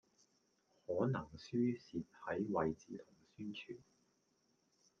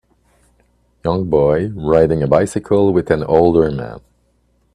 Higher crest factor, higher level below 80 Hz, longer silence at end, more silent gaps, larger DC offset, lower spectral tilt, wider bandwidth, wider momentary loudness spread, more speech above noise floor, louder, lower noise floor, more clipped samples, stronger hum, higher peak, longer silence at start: first, 22 dB vs 16 dB; second, -74 dBFS vs -40 dBFS; first, 1.2 s vs 0.75 s; neither; neither; about the same, -7.5 dB/octave vs -8 dB/octave; second, 7 kHz vs 11.5 kHz; first, 16 LU vs 8 LU; second, 38 dB vs 45 dB; second, -42 LUFS vs -15 LUFS; first, -79 dBFS vs -60 dBFS; neither; second, none vs 60 Hz at -40 dBFS; second, -22 dBFS vs 0 dBFS; second, 0.9 s vs 1.05 s